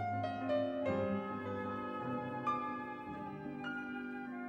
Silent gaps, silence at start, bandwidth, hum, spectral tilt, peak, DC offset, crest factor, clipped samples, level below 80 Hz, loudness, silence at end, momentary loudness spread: none; 0 s; 8 kHz; none; -8 dB/octave; -24 dBFS; under 0.1%; 14 dB; under 0.1%; -72 dBFS; -40 LUFS; 0 s; 8 LU